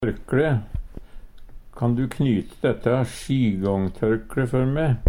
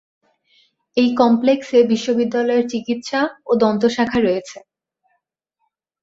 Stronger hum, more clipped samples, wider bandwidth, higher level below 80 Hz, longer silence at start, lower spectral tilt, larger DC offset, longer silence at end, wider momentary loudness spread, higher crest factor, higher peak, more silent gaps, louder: neither; neither; first, 14.5 kHz vs 7.8 kHz; first, -38 dBFS vs -56 dBFS; second, 0 s vs 0.95 s; first, -8 dB/octave vs -5.5 dB/octave; neither; second, 0 s vs 1.45 s; second, 5 LU vs 8 LU; about the same, 18 dB vs 18 dB; about the same, -4 dBFS vs -2 dBFS; neither; second, -23 LUFS vs -18 LUFS